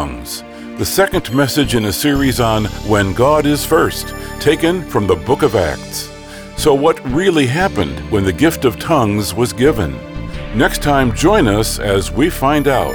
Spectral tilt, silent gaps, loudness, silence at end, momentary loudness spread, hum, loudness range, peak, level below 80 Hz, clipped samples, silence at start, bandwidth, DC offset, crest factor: -5 dB/octave; none; -15 LUFS; 0 s; 11 LU; none; 1 LU; -2 dBFS; -30 dBFS; under 0.1%; 0 s; over 20 kHz; under 0.1%; 14 dB